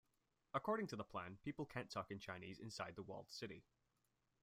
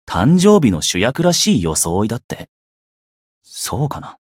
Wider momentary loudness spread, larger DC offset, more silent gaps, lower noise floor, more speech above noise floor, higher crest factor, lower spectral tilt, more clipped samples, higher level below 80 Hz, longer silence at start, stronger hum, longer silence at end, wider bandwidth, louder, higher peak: second, 9 LU vs 15 LU; neither; second, none vs 2.24-2.29 s, 2.49-3.41 s; second, -86 dBFS vs under -90 dBFS; second, 37 dB vs over 75 dB; first, 22 dB vs 16 dB; about the same, -5.5 dB/octave vs -4.5 dB/octave; neither; second, -78 dBFS vs -42 dBFS; first, 0.55 s vs 0.1 s; neither; first, 0.8 s vs 0.15 s; about the same, 16 kHz vs 16.5 kHz; second, -49 LUFS vs -15 LUFS; second, -28 dBFS vs 0 dBFS